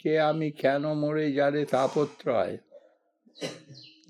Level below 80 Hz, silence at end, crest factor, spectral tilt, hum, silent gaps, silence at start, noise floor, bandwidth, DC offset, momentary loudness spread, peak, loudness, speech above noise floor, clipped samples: -80 dBFS; 0.25 s; 18 dB; -6.5 dB/octave; none; none; 0.05 s; -64 dBFS; 13 kHz; under 0.1%; 13 LU; -12 dBFS; -27 LUFS; 37 dB; under 0.1%